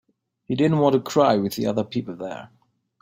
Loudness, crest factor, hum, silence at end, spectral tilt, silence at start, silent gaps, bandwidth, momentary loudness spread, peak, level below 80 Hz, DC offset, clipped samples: -22 LUFS; 18 dB; none; 0.55 s; -6.5 dB/octave; 0.5 s; none; 16.5 kHz; 14 LU; -4 dBFS; -62 dBFS; under 0.1%; under 0.1%